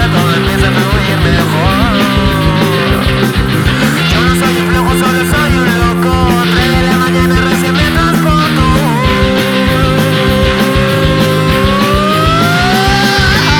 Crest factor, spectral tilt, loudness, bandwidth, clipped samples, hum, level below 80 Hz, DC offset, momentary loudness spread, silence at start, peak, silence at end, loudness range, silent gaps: 10 dB; -5.5 dB/octave; -10 LUFS; 19.5 kHz; under 0.1%; none; -20 dBFS; under 0.1%; 2 LU; 0 s; 0 dBFS; 0 s; 1 LU; none